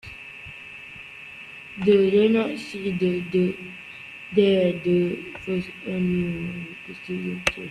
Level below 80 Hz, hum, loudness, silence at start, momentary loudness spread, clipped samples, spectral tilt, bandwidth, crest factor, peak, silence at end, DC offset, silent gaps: -54 dBFS; none; -23 LUFS; 0.05 s; 19 LU; under 0.1%; -6.5 dB/octave; 11.5 kHz; 20 dB; -6 dBFS; 0 s; under 0.1%; none